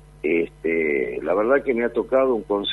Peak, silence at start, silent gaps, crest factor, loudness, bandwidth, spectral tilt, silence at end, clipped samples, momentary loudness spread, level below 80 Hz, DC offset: -6 dBFS; 0.25 s; none; 14 dB; -22 LUFS; 10.5 kHz; -6.5 dB/octave; 0 s; under 0.1%; 4 LU; -50 dBFS; under 0.1%